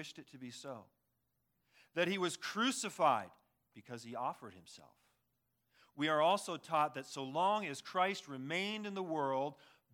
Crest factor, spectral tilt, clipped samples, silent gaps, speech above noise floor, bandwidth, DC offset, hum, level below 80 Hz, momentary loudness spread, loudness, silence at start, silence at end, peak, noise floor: 20 dB; -3.5 dB/octave; under 0.1%; none; 45 dB; 18 kHz; under 0.1%; none; under -90 dBFS; 18 LU; -37 LUFS; 0 s; 0.4 s; -18 dBFS; -83 dBFS